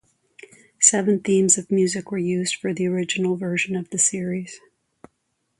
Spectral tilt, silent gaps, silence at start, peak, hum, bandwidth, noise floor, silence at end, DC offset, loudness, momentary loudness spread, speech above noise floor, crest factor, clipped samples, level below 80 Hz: -3.5 dB/octave; none; 0.8 s; 0 dBFS; none; 11.5 kHz; -73 dBFS; 1 s; under 0.1%; -21 LUFS; 10 LU; 51 dB; 22 dB; under 0.1%; -66 dBFS